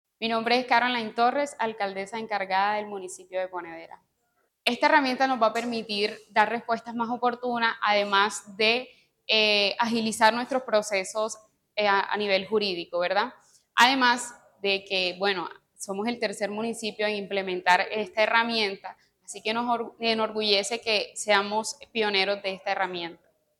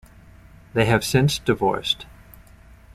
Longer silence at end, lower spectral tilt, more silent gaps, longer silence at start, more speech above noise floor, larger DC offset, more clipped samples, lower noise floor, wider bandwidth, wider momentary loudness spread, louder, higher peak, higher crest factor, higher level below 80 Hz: second, 0.45 s vs 0.9 s; second, -2.5 dB/octave vs -5 dB/octave; neither; second, 0.2 s vs 0.75 s; first, 47 dB vs 27 dB; neither; neither; first, -73 dBFS vs -48 dBFS; about the same, 16 kHz vs 15.5 kHz; first, 11 LU vs 8 LU; second, -25 LUFS vs -21 LUFS; about the same, -6 dBFS vs -4 dBFS; about the same, 22 dB vs 20 dB; second, -76 dBFS vs -46 dBFS